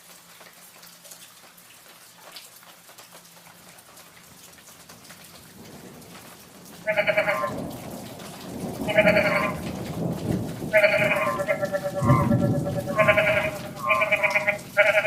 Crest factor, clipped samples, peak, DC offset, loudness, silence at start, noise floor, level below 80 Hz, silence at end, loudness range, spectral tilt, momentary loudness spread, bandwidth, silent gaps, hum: 20 dB; under 0.1%; -6 dBFS; under 0.1%; -23 LUFS; 0.1 s; -49 dBFS; -54 dBFS; 0 s; 23 LU; -5.5 dB/octave; 26 LU; 16 kHz; none; none